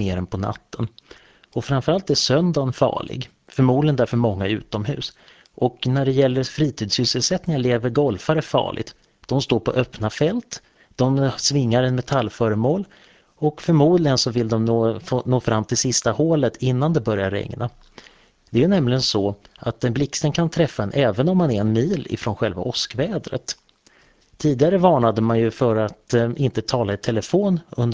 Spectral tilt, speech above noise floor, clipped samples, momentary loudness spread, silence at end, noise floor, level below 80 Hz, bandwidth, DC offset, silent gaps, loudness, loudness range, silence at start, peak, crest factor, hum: -5.5 dB/octave; 36 dB; under 0.1%; 11 LU; 0 s; -56 dBFS; -46 dBFS; 8 kHz; under 0.1%; none; -21 LUFS; 3 LU; 0 s; -2 dBFS; 20 dB; none